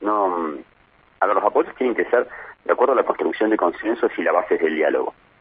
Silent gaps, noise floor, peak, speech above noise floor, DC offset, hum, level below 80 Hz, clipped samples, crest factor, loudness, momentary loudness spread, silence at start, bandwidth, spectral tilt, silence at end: none; -56 dBFS; -2 dBFS; 36 dB; under 0.1%; none; -62 dBFS; under 0.1%; 18 dB; -21 LUFS; 9 LU; 0 s; 4.9 kHz; -9 dB/octave; 0.3 s